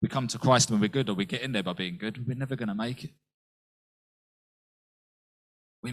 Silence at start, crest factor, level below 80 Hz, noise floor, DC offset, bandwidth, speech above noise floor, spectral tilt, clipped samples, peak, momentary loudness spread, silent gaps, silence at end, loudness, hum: 0 s; 24 dB; -62 dBFS; under -90 dBFS; under 0.1%; 14.5 kHz; over 62 dB; -4.5 dB/octave; under 0.1%; -8 dBFS; 13 LU; 3.34-5.83 s; 0 s; -28 LUFS; none